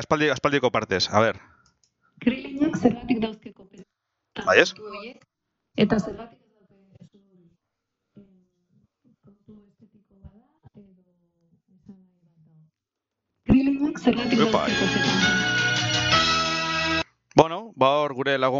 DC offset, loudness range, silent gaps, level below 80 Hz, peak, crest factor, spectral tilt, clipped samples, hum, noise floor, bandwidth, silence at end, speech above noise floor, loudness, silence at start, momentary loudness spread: under 0.1%; 10 LU; none; -50 dBFS; 0 dBFS; 26 dB; -4.5 dB/octave; under 0.1%; none; -85 dBFS; 7.8 kHz; 0 s; 63 dB; -22 LUFS; 0 s; 17 LU